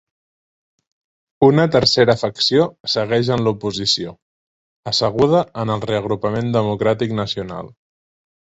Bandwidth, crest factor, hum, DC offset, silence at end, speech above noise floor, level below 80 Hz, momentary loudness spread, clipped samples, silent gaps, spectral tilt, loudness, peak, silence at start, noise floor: 8.2 kHz; 18 dB; none; under 0.1%; 0.85 s; over 73 dB; -50 dBFS; 9 LU; under 0.1%; 2.80-2.84 s, 4.22-4.83 s; -5.5 dB/octave; -17 LUFS; -2 dBFS; 1.4 s; under -90 dBFS